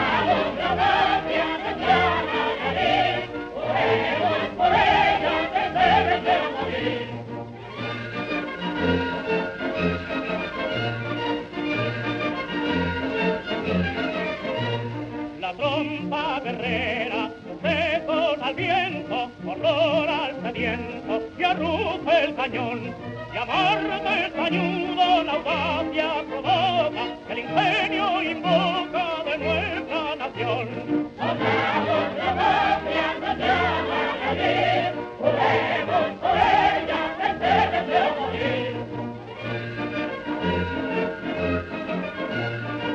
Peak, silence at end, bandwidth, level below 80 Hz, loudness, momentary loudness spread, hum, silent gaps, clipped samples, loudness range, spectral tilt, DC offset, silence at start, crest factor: -6 dBFS; 0 s; 8.4 kHz; -50 dBFS; -24 LUFS; 9 LU; none; none; under 0.1%; 5 LU; -6 dB/octave; under 0.1%; 0 s; 18 dB